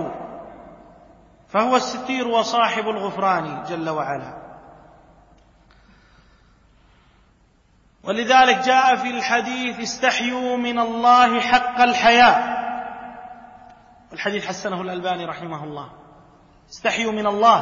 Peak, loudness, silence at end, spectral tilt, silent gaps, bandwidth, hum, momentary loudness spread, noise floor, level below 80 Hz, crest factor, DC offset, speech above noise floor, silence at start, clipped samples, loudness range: -2 dBFS; -19 LUFS; 0 s; -3.5 dB/octave; none; 7.4 kHz; none; 22 LU; -57 dBFS; -56 dBFS; 20 dB; under 0.1%; 38 dB; 0 s; under 0.1%; 12 LU